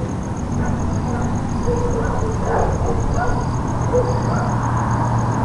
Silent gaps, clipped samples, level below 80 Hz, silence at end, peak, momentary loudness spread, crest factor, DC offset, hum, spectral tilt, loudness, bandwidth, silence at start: none; under 0.1%; -28 dBFS; 0 s; -4 dBFS; 3 LU; 14 dB; under 0.1%; none; -7.5 dB/octave; -20 LUFS; 11 kHz; 0 s